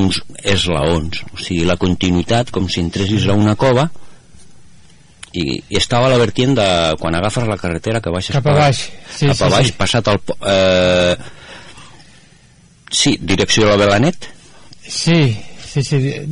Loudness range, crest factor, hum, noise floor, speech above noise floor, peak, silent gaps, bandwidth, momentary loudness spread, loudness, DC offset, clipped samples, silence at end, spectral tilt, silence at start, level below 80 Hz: 3 LU; 14 dB; none; -47 dBFS; 33 dB; -2 dBFS; none; 11 kHz; 11 LU; -15 LUFS; under 0.1%; under 0.1%; 0 s; -5 dB/octave; 0 s; -38 dBFS